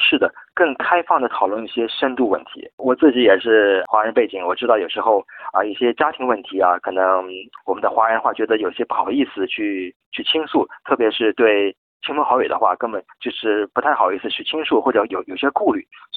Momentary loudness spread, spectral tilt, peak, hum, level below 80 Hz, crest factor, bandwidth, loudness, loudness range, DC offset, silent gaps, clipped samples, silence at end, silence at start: 9 LU; -7.5 dB/octave; -2 dBFS; none; -64 dBFS; 18 dB; 4.6 kHz; -19 LUFS; 3 LU; under 0.1%; 2.73-2.78 s, 9.96-10.00 s, 10.06-10.12 s, 11.78-12.00 s; under 0.1%; 0 s; 0 s